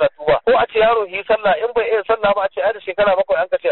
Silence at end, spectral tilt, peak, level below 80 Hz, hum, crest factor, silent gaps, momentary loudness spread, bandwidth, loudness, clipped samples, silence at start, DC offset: 0 s; -1.5 dB/octave; -6 dBFS; -48 dBFS; none; 10 dB; none; 5 LU; 4.3 kHz; -17 LUFS; under 0.1%; 0 s; under 0.1%